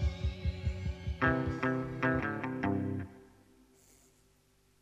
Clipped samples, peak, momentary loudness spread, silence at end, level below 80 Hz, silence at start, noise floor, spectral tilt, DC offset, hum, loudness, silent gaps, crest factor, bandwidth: under 0.1%; -16 dBFS; 8 LU; 1.55 s; -44 dBFS; 0 s; -69 dBFS; -7.5 dB/octave; under 0.1%; 50 Hz at -60 dBFS; -34 LUFS; none; 20 dB; 10.5 kHz